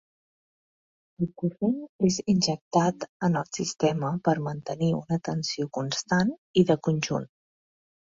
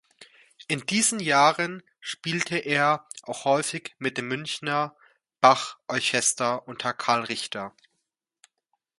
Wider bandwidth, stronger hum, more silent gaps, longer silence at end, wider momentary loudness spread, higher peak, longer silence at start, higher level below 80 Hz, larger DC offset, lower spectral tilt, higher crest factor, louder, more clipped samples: second, 7.8 kHz vs 11.5 kHz; neither; first, 1.89-1.99 s, 2.61-2.71 s, 3.09-3.20 s, 6.38-6.54 s vs none; second, 0.75 s vs 1.3 s; second, 7 LU vs 13 LU; second, -8 dBFS vs -4 dBFS; first, 1.2 s vs 0.2 s; first, -62 dBFS vs -72 dBFS; neither; first, -5.5 dB/octave vs -2.5 dB/octave; about the same, 20 dB vs 24 dB; about the same, -27 LUFS vs -25 LUFS; neither